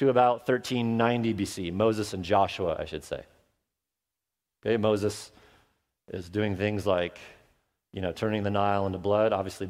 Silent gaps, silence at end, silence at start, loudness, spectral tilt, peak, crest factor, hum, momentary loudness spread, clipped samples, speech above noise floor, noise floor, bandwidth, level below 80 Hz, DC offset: none; 0 s; 0 s; -28 LUFS; -6 dB/octave; -8 dBFS; 20 dB; none; 14 LU; under 0.1%; 61 dB; -88 dBFS; 16 kHz; -58 dBFS; under 0.1%